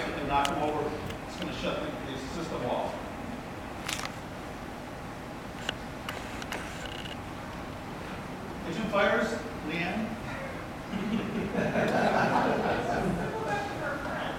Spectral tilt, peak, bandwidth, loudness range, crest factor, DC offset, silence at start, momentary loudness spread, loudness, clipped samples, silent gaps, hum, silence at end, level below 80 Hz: -5 dB/octave; -10 dBFS; 16 kHz; 9 LU; 24 dB; under 0.1%; 0 s; 13 LU; -32 LUFS; under 0.1%; none; none; 0 s; -50 dBFS